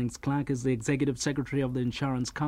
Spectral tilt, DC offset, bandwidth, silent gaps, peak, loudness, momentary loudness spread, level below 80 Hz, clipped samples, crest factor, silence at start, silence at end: -6 dB/octave; under 0.1%; 13 kHz; none; -16 dBFS; -30 LUFS; 3 LU; -52 dBFS; under 0.1%; 14 dB; 0 s; 0 s